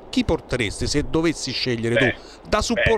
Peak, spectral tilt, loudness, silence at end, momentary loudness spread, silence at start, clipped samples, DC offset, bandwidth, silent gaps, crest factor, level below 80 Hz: -4 dBFS; -4.5 dB/octave; -22 LUFS; 0 s; 5 LU; 0 s; under 0.1%; under 0.1%; 13.5 kHz; none; 18 dB; -34 dBFS